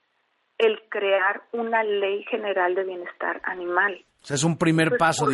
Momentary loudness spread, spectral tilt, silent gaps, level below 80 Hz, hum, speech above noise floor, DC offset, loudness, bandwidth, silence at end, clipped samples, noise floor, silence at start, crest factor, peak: 9 LU; -4.5 dB/octave; none; -64 dBFS; none; 47 dB; under 0.1%; -24 LUFS; 11.5 kHz; 0 s; under 0.1%; -70 dBFS; 0.6 s; 18 dB; -6 dBFS